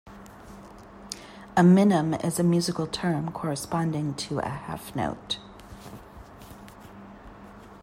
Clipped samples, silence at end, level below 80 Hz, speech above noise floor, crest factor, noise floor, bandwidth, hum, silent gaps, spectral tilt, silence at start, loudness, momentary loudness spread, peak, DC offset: under 0.1%; 0.05 s; -54 dBFS; 22 dB; 20 dB; -46 dBFS; 15.5 kHz; none; none; -6 dB/octave; 0.05 s; -25 LUFS; 26 LU; -8 dBFS; under 0.1%